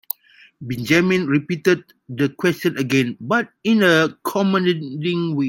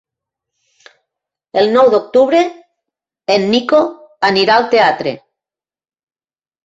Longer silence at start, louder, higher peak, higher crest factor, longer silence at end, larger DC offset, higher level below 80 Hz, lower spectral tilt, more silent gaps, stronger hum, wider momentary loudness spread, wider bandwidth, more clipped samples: second, 0.6 s vs 1.55 s; second, -19 LUFS vs -13 LUFS; about the same, -2 dBFS vs 0 dBFS; about the same, 18 dB vs 14 dB; second, 0 s vs 1.5 s; neither; about the same, -60 dBFS vs -60 dBFS; about the same, -5.5 dB/octave vs -5 dB/octave; neither; neither; about the same, 12 LU vs 11 LU; first, 17 kHz vs 7.8 kHz; neither